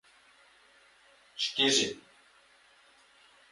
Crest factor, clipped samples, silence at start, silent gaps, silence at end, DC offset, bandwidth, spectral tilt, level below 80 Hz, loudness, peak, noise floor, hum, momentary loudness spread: 24 dB; under 0.1%; 1.35 s; none; 1.5 s; under 0.1%; 11.5 kHz; -1 dB/octave; -78 dBFS; -27 LUFS; -12 dBFS; -62 dBFS; none; 23 LU